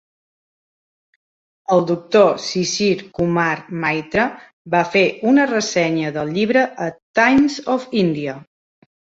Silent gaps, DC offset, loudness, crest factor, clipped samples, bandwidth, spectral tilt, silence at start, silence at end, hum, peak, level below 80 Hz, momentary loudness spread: 4.53-4.65 s, 7.02-7.14 s; under 0.1%; -18 LUFS; 18 dB; under 0.1%; 8 kHz; -5 dB/octave; 1.7 s; 0.75 s; none; -2 dBFS; -54 dBFS; 8 LU